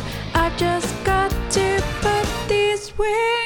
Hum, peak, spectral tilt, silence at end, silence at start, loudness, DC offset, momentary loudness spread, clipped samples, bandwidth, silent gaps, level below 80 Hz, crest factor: none; -6 dBFS; -4 dB/octave; 0 s; 0 s; -21 LUFS; under 0.1%; 3 LU; under 0.1%; over 20 kHz; none; -32 dBFS; 16 dB